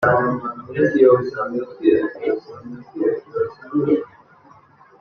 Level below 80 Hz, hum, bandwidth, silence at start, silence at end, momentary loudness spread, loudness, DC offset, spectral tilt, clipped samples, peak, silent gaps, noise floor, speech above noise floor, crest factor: -58 dBFS; none; 6.4 kHz; 0 s; 0.95 s; 13 LU; -20 LUFS; under 0.1%; -9 dB/octave; under 0.1%; -2 dBFS; none; -50 dBFS; 31 dB; 18 dB